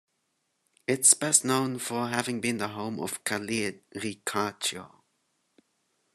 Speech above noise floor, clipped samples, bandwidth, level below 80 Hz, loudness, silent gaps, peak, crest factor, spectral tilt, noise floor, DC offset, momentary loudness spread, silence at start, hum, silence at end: 48 dB; under 0.1%; 13 kHz; -72 dBFS; -27 LUFS; none; -6 dBFS; 24 dB; -2.5 dB/octave; -77 dBFS; under 0.1%; 14 LU; 0.9 s; none; 1.25 s